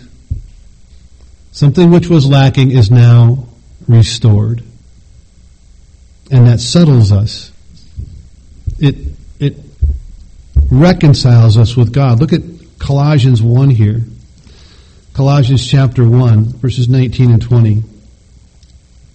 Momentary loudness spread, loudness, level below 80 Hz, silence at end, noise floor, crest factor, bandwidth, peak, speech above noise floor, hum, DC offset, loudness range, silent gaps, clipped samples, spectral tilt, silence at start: 18 LU; -9 LUFS; -26 dBFS; 1.3 s; -42 dBFS; 10 dB; 8.6 kHz; 0 dBFS; 34 dB; none; under 0.1%; 5 LU; none; 0.3%; -7.5 dB/octave; 0.3 s